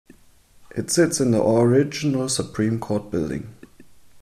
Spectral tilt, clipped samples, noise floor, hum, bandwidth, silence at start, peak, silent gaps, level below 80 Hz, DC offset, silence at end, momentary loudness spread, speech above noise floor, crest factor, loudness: -5 dB/octave; under 0.1%; -53 dBFS; none; 14.5 kHz; 0.6 s; -6 dBFS; none; -52 dBFS; under 0.1%; 0.65 s; 14 LU; 32 dB; 16 dB; -21 LUFS